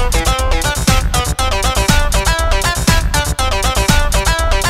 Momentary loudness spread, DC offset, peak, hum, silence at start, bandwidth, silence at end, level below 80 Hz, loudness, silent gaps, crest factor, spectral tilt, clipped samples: 3 LU; under 0.1%; 0 dBFS; none; 0 s; 16.5 kHz; 0 s; -16 dBFS; -14 LUFS; none; 12 dB; -3.5 dB/octave; under 0.1%